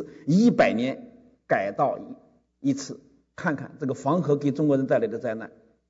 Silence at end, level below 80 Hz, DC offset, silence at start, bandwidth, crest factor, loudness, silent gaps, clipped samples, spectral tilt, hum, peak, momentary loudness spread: 0.4 s; -66 dBFS; under 0.1%; 0 s; 8 kHz; 16 dB; -25 LUFS; none; under 0.1%; -7 dB/octave; none; -8 dBFS; 16 LU